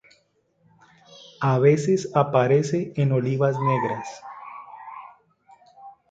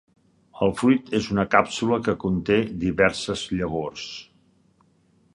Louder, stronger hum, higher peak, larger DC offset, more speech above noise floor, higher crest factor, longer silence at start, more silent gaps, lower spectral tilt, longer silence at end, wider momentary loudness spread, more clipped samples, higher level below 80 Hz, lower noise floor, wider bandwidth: about the same, -22 LUFS vs -23 LUFS; neither; about the same, -4 dBFS vs -2 dBFS; neither; first, 45 dB vs 39 dB; about the same, 20 dB vs 22 dB; first, 1.4 s vs 0.55 s; neither; first, -7.5 dB/octave vs -5.5 dB/octave; second, 0.2 s vs 1.1 s; first, 21 LU vs 10 LU; neither; second, -66 dBFS vs -48 dBFS; first, -66 dBFS vs -62 dBFS; second, 8 kHz vs 11.5 kHz